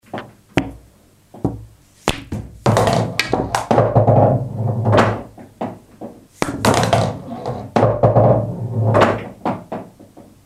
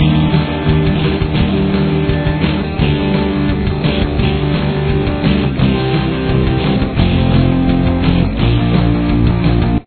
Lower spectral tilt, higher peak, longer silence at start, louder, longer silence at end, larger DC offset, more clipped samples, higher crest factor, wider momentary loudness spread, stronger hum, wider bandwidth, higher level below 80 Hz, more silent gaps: second, -6 dB/octave vs -11 dB/octave; about the same, 0 dBFS vs 0 dBFS; first, 0.15 s vs 0 s; second, -17 LUFS vs -14 LUFS; first, 0.4 s vs 0.05 s; neither; neither; first, 18 dB vs 12 dB; first, 18 LU vs 3 LU; neither; first, 14.5 kHz vs 4.5 kHz; second, -40 dBFS vs -22 dBFS; neither